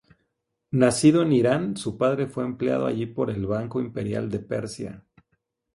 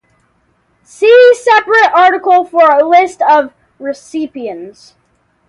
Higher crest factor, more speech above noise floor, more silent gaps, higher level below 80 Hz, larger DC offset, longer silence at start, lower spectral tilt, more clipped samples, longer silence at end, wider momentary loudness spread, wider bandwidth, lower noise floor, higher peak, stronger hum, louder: first, 20 dB vs 10 dB; first, 54 dB vs 47 dB; neither; first, -56 dBFS vs -62 dBFS; neither; second, 0.7 s vs 1 s; first, -6 dB/octave vs -2.5 dB/octave; neither; about the same, 0.75 s vs 0.8 s; second, 12 LU vs 18 LU; about the same, 11.5 kHz vs 11.5 kHz; first, -78 dBFS vs -57 dBFS; second, -4 dBFS vs 0 dBFS; neither; second, -24 LUFS vs -8 LUFS